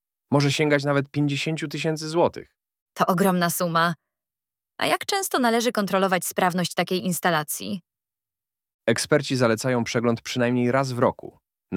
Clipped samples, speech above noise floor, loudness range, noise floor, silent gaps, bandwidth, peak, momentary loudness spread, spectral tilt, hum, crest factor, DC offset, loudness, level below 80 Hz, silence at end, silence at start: under 0.1%; over 67 dB; 2 LU; under -90 dBFS; 2.82-2.86 s, 8.74-8.79 s; 18 kHz; -4 dBFS; 6 LU; -4.5 dB/octave; none; 20 dB; under 0.1%; -23 LUFS; -66 dBFS; 0 s; 0.3 s